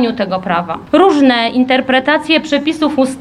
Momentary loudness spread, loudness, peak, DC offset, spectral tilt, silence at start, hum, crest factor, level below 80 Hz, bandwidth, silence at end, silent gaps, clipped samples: 7 LU; -12 LUFS; 0 dBFS; under 0.1%; -5 dB/octave; 0 s; none; 12 dB; -50 dBFS; 11.5 kHz; 0 s; none; under 0.1%